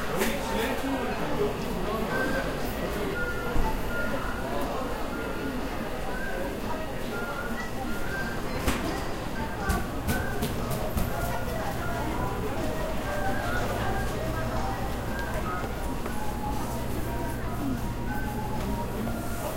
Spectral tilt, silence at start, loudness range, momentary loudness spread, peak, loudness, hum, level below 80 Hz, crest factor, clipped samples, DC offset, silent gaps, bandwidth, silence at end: -5.5 dB/octave; 0 s; 3 LU; 4 LU; -12 dBFS; -31 LUFS; none; -36 dBFS; 18 dB; under 0.1%; under 0.1%; none; 16 kHz; 0 s